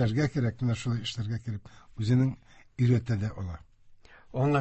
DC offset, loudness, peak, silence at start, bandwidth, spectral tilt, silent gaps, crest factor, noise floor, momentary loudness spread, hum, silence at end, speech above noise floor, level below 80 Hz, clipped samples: under 0.1%; -30 LUFS; -12 dBFS; 0 s; 8.4 kHz; -7.5 dB/octave; none; 16 dB; -54 dBFS; 16 LU; none; 0 s; 26 dB; -50 dBFS; under 0.1%